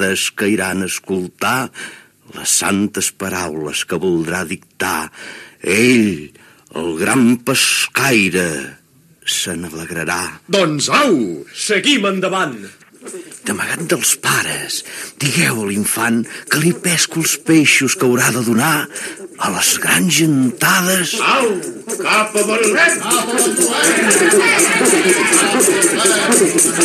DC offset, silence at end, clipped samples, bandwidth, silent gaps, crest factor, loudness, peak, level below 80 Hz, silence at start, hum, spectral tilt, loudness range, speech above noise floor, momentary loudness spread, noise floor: under 0.1%; 0 s; under 0.1%; 14 kHz; none; 16 dB; -14 LUFS; 0 dBFS; -58 dBFS; 0 s; none; -2.5 dB/octave; 7 LU; 32 dB; 13 LU; -47 dBFS